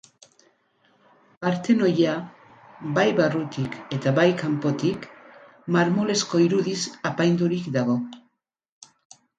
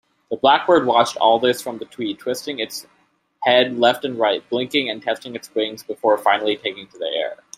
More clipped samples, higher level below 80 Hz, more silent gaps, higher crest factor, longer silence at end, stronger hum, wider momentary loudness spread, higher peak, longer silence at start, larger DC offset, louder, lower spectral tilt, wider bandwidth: neither; about the same, -66 dBFS vs -66 dBFS; neither; about the same, 18 dB vs 18 dB; first, 1.2 s vs 0.25 s; neither; about the same, 11 LU vs 12 LU; second, -6 dBFS vs -2 dBFS; first, 1.4 s vs 0.3 s; neither; second, -23 LUFS vs -20 LUFS; first, -5.5 dB/octave vs -3.5 dB/octave; second, 9.2 kHz vs 16 kHz